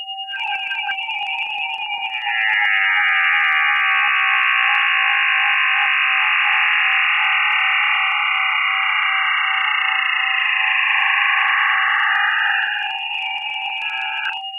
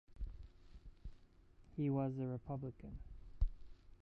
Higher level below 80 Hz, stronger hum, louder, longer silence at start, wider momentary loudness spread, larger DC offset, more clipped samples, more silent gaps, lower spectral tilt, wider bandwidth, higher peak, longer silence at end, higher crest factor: second, -80 dBFS vs -48 dBFS; neither; first, -16 LUFS vs -44 LUFS; about the same, 0 s vs 0.1 s; second, 8 LU vs 22 LU; neither; neither; neither; second, 2.5 dB/octave vs -11 dB/octave; first, 10 kHz vs 5.2 kHz; first, -4 dBFS vs -24 dBFS; about the same, 0 s vs 0.05 s; second, 14 dB vs 20 dB